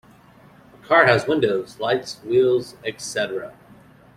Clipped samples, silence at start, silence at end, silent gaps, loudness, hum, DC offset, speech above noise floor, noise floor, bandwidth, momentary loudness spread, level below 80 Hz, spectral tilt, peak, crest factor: under 0.1%; 0.9 s; 0.65 s; none; -20 LUFS; none; under 0.1%; 29 dB; -50 dBFS; 13.5 kHz; 15 LU; -60 dBFS; -4.5 dB/octave; -2 dBFS; 20 dB